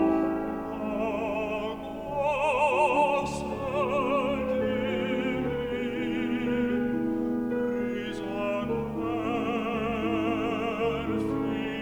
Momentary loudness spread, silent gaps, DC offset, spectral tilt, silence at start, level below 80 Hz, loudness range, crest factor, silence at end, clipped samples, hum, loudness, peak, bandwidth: 7 LU; none; under 0.1%; -6.5 dB/octave; 0 s; -50 dBFS; 3 LU; 16 dB; 0 s; under 0.1%; none; -28 LUFS; -12 dBFS; over 20 kHz